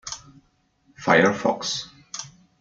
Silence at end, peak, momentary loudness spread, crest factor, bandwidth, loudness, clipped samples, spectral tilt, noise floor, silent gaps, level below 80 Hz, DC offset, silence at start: 0.3 s; -2 dBFS; 19 LU; 24 dB; 9.2 kHz; -21 LUFS; under 0.1%; -3.5 dB/octave; -64 dBFS; none; -62 dBFS; under 0.1%; 0.05 s